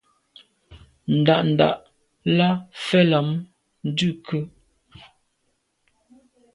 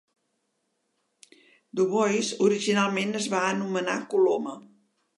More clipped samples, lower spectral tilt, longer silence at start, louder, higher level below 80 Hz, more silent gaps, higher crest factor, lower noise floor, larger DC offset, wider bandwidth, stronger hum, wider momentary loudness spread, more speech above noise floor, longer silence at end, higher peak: neither; first, -7 dB/octave vs -4.5 dB/octave; second, 0.7 s vs 1.75 s; first, -21 LUFS vs -25 LUFS; first, -60 dBFS vs -82 dBFS; neither; about the same, 20 dB vs 18 dB; second, -71 dBFS vs -76 dBFS; neither; about the same, 11 kHz vs 11.5 kHz; neither; first, 14 LU vs 7 LU; about the same, 51 dB vs 51 dB; first, 2.05 s vs 0.55 s; first, -4 dBFS vs -10 dBFS